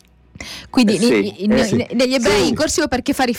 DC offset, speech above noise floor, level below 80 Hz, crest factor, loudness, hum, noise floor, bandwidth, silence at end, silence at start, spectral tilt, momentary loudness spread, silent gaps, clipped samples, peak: under 0.1%; 21 dB; -42 dBFS; 12 dB; -16 LUFS; none; -37 dBFS; 17.5 kHz; 0 s; 0.4 s; -4 dB/octave; 9 LU; none; under 0.1%; -6 dBFS